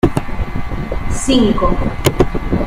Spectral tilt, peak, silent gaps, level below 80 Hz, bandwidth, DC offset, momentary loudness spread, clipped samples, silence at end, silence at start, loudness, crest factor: -5.5 dB/octave; 0 dBFS; none; -22 dBFS; 16.5 kHz; under 0.1%; 11 LU; under 0.1%; 0 s; 0.05 s; -17 LUFS; 14 dB